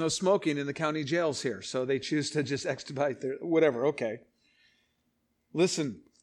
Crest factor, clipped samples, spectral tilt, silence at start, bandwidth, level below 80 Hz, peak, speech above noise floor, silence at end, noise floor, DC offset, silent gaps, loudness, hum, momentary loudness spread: 20 dB; under 0.1%; -4.5 dB/octave; 0 s; 12 kHz; -72 dBFS; -12 dBFS; 46 dB; 0.2 s; -76 dBFS; under 0.1%; none; -30 LUFS; none; 9 LU